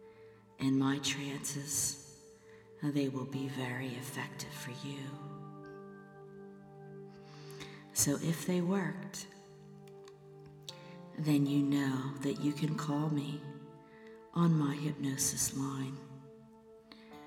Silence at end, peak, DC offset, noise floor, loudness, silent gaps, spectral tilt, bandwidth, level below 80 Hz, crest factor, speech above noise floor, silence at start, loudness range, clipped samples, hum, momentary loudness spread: 0 s; -16 dBFS; under 0.1%; -58 dBFS; -35 LUFS; none; -4.5 dB/octave; 18 kHz; -70 dBFS; 20 dB; 23 dB; 0 s; 9 LU; under 0.1%; none; 23 LU